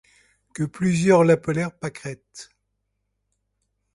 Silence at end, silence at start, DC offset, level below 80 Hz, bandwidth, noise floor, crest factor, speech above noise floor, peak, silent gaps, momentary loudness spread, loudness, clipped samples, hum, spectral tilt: 1.5 s; 0.6 s; under 0.1%; -60 dBFS; 11.5 kHz; -76 dBFS; 20 dB; 55 dB; -4 dBFS; none; 24 LU; -21 LUFS; under 0.1%; 50 Hz at -60 dBFS; -6.5 dB/octave